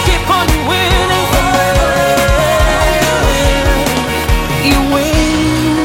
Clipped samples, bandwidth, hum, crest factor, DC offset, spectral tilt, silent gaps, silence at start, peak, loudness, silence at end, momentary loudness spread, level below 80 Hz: under 0.1%; 17 kHz; none; 12 dB; under 0.1%; -4.5 dB/octave; none; 0 s; 0 dBFS; -12 LUFS; 0 s; 2 LU; -18 dBFS